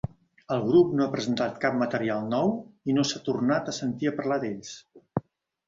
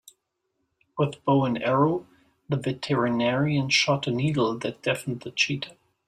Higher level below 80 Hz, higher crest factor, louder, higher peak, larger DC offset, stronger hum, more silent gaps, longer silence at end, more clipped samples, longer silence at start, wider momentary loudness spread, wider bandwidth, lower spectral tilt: about the same, -60 dBFS vs -62 dBFS; about the same, 18 dB vs 18 dB; about the same, -27 LUFS vs -25 LUFS; about the same, -10 dBFS vs -8 dBFS; neither; neither; neither; first, 0.5 s vs 0.35 s; neither; second, 0.5 s vs 0.95 s; first, 13 LU vs 10 LU; second, 7.8 kHz vs 13.5 kHz; about the same, -5.5 dB/octave vs -5.5 dB/octave